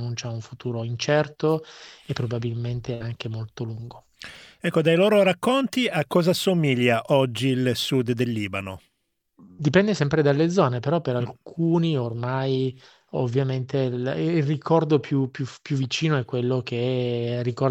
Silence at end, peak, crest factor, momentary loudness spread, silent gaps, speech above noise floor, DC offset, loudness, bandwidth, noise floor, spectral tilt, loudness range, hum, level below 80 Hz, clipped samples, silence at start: 0 s; -4 dBFS; 20 dB; 13 LU; none; 52 dB; under 0.1%; -24 LUFS; 18 kHz; -76 dBFS; -6.5 dB/octave; 6 LU; none; -60 dBFS; under 0.1%; 0 s